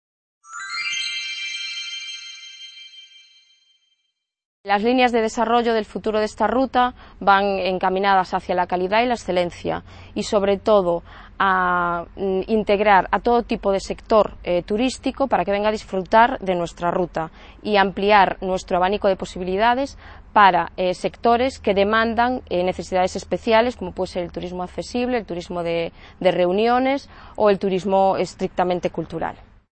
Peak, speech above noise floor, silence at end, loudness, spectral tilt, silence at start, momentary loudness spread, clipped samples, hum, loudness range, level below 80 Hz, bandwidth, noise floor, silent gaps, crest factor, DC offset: 0 dBFS; 55 dB; 0.3 s; -20 LUFS; -5 dB/octave; 0.5 s; 12 LU; under 0.1%; none; 5 LU; -46 dBFS; 8.8 kHz; -75 dBFS; 4.45-4.64 s; 20 dB; under 0.1%